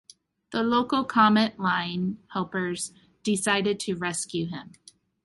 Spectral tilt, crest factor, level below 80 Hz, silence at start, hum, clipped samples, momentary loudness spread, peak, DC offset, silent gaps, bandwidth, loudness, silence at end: -4 dB/octave; 20 dB; -64 dBFS; 0.5 s; none; under 0.1%; 13 LU; -6 dBFS; under 0.1%; none; 11.5 kHz; -26 LUFS; 0.55 s